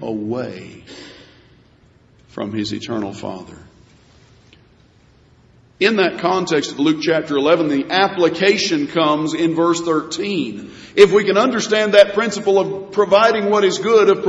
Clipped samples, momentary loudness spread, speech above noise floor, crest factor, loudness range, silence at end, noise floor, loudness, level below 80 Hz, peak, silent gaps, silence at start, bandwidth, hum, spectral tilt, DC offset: under 0.1%; 17 LU; 35 dB; 18 dB; 15 LU; 0 s; -52 dBFS; -16 LUFS; -58 dBFS; 0 dBFS; none; 0 s; 9.2 kHz; none; -4.5 dB/octave; under 0.1%